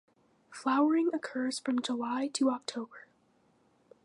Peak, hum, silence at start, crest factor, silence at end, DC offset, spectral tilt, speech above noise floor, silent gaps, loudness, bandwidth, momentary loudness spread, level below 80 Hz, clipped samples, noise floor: -16 dBFS; none; 0.5 s; 16 dB; 1.05 s; under 0.1%; -3 dB/octave; 38 dB; none; -31 LUFS; 11.5 kHz; 13 LU; -88 dBFS; under 0.1%; -69 dBFS